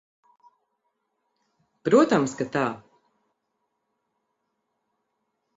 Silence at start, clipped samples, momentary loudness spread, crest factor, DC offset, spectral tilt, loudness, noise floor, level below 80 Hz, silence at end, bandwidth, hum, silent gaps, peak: 1.85 s; under 0.1%; 14 LU; 22 dB; under 0.1%; -6 dB/octave; -23 LUFS; -78 dBFS; -70 dBFS; 2.8 s; 8 kHz; none; none; -6 dBFS